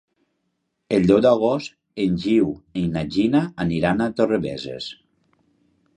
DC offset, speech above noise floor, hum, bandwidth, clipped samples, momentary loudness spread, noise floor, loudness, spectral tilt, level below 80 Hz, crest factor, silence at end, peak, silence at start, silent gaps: under 0.1%; 54 dB; none; 10 kHz; under 0.1%; 14 LU; -74 dBFS; -21 LUFS; -7.5 dB/octave; -50 dBFS; 18 dB; 1.05 s; -4 dBFS; 0.9 s; none